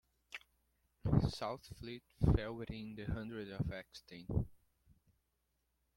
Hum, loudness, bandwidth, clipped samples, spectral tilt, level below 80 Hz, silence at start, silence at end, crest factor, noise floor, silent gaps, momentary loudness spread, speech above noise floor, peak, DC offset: none; -40 LUFS; 16.5 kHz; under 0.1%; -7.5 dB/octave; -50 dBFS; 0.3 s; 1.4 s; 24 dB; -83 dBFS; none; 18 LU; 43 dB; -18 dBFS; under 0.1%